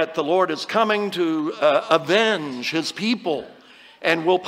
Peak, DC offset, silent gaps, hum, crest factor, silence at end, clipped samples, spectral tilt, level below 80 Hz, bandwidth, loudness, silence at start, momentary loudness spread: -2 dBFS; under 0.1%; none; none; 18 dB; 0 s; under 0.1%; -4.5 dB/octave; -72 dBFS; 16 kHz; -21 LUFS; 0 s; 6 LU